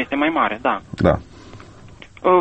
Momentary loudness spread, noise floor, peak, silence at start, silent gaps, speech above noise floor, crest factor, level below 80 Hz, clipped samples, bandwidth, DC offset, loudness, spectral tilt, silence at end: 15 LU; -42 dBFS; 0 dBFS; 0 s; none; 22 dB; 20 dB; -40 dBFS; under 0.1%; 8.4 kHz; under 0.1%; -20 LUFS; -7.5 dB/octave; 0 s